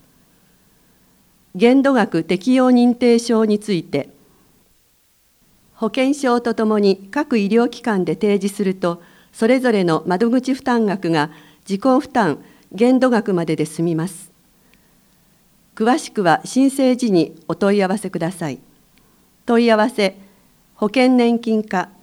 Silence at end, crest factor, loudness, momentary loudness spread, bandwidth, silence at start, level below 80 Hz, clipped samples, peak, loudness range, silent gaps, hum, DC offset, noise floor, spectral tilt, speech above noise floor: 0.15 s; 18 dB; -17 LUFS; 10 LU; 14 kHz; 1.55 s; -62 dBFS; under 0.1%; 0 dBFS; 5 LU; none; none; under 0.1%; -58 dBFS; -6 dB/octave; 42 dB